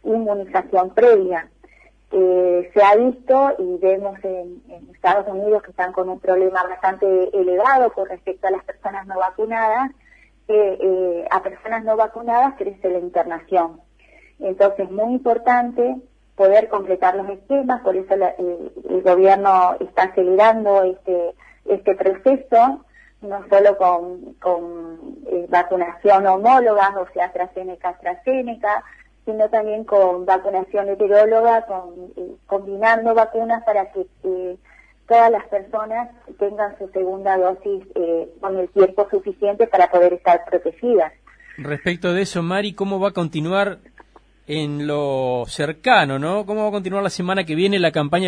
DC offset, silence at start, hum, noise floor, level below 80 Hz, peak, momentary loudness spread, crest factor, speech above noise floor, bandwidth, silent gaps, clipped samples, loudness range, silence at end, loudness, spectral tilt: under 0.1%; 0.05 s; none; -51 dBFS; -56 dBFS; 0 dBFS; 13 LU; 18 dB; 33 dB; 10.5 kHz; none; under 0.1%; 5 LU; 0 s; -18 LUFS; -6 dB/octave